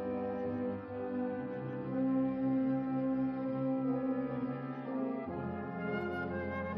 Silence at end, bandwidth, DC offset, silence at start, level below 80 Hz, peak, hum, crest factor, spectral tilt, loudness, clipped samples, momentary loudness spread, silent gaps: 0 s; 5 kHz; under 0.1%; 0 s; -60 dBFS; -24 dBFS; none; 12 dB; -8 dB/octave; -36 LUFS; under 0.1%; 7 LU; none